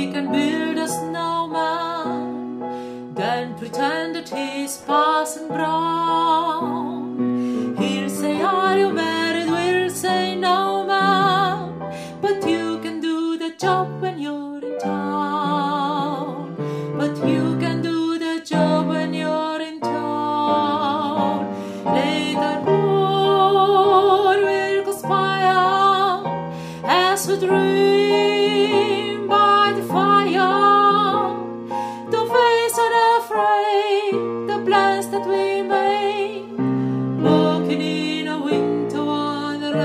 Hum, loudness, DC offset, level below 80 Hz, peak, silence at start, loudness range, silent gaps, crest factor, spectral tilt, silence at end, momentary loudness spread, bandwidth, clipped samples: none; -20 LUFS; under 0.1%; -66 dBFS; -4 dBFS; 0 s; 7 LU; none; 16 dB; -5 dB/octave; 0 s; 11 LU; 15.5 kHz; under 0.1%